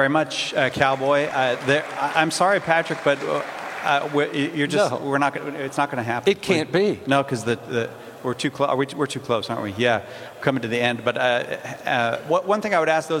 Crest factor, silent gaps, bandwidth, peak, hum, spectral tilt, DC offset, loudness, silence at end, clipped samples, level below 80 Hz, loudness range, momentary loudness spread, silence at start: 20 dB; none; 16.5 kHz; -2 dBFS; none; -4.5 dB/octave; under 0.1%; -22 LUFS; 0 s; under 0.1%; -64 dBFS; 3 LU; 7 LU; 0 s